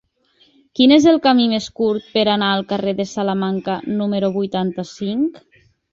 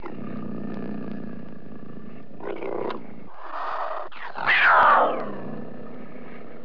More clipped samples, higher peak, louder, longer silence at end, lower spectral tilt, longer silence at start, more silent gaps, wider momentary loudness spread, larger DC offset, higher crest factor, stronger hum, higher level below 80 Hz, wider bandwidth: neither; first, -2 dBFS vs -8 dBFS; first, -18 LUFS vs -23 LUFS; first, 0.55 s vs 0 s; about the same, -5.5 dB/octave vs -6.5 dB/octave; first, 0.75 s vs 0 s; neither; second, 11 LU vs 25 LU; second, under 0.1% vs 3%; about the same, 16 dB vs 18 dB; neither; first, -58 dBFS vs -64 dBFS; first, 7.6 kHz vs 5.4 kHz